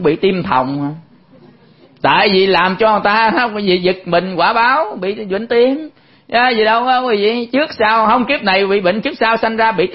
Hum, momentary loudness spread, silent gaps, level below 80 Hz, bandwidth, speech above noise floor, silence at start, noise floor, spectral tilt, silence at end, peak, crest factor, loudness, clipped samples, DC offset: none; 8 LU; none; -50 dBFS; 5.8 kHz; 32 dB; 0 s; -46 dBFS; -8.5 dB/octave; 0 s; 0 dBFS; 14 dB; -14 LUFS; under 0.1%; 0.1%